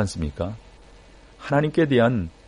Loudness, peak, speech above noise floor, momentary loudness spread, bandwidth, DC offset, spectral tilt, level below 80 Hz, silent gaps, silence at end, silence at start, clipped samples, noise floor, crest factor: -22 LUFS; -6 dBFS; 26 dB; 17 LU; 10.5 kHz; under 0.1%; -7 dB/octave; -42 dBFS; none; 0.2 s; 0 s; under 0.1%; -48 dBFS; 18 dB